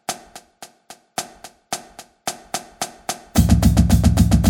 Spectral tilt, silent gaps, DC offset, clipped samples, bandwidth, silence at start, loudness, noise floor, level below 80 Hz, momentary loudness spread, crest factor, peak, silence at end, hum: -5.5 dB/octave; none; under 0.1%; under 0.1%; 18 kHz; 0.1 s; -20 LUFS; -47 dBFS; -24 dBFS; 17 LU; 18 dB; -2 dBFS; 0 s; none